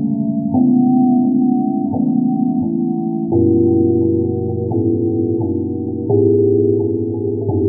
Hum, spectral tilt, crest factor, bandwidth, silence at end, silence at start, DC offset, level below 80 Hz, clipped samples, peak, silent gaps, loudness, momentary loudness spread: none; -16.5 dB/octave; 12 dB; 0.9 kHz; 0 s; 0 s; under 0.1%; -52 dBFS; under 0.1%; -2 dBFS; none; -16 LUFS; 7 LU